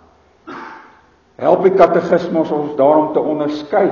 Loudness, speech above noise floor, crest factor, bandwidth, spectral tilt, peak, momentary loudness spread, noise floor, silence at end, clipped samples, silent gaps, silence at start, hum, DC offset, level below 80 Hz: -14 LUFS; 36 dB; 16 dB; 7.2 kHz; -8 dB/octave; 0 dBFS; 21 LU; -49 dBFS; 0 s; under 0.1%; none; 0.45 s; none; under 0.1%; -54 dBFS